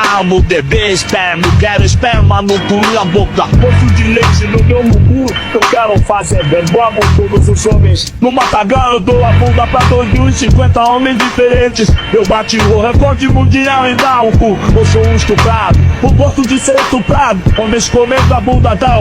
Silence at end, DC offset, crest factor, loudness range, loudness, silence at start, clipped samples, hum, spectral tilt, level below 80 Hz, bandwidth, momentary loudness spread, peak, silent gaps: 0 s; under 0.1%; 8 dB; 1 LU; -9 LUFS; 0 s; under 0.1%; none; -5.5 dB/octave; -18 dBFS; 13.5 kHz; 3 LU; 0 dBFS; none